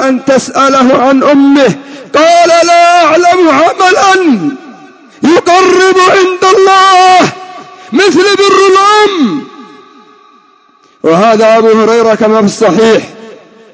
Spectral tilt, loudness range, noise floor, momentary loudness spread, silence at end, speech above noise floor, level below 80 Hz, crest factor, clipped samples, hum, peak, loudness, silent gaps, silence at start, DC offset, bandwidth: -4 dB/octave; 3 LU; -44 dBFS; 9 LU; 0.4 s; 39 dB; -52 dBFS; 6 dB; 2%; none; 0 dBFS; -6 LUFS; none; 0 s; under 0.1%; 8 kHz